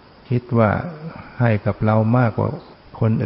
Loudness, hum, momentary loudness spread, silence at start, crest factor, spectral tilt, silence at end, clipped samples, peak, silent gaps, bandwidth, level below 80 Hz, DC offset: -20 LUFS; none; 15 LU; 0.3 s; 16 dB; -13.5 dB/octave; 0 s; under 0.1%; -4 dBFS; none; 5.6 kHz; -46 dBFS; under 0.1%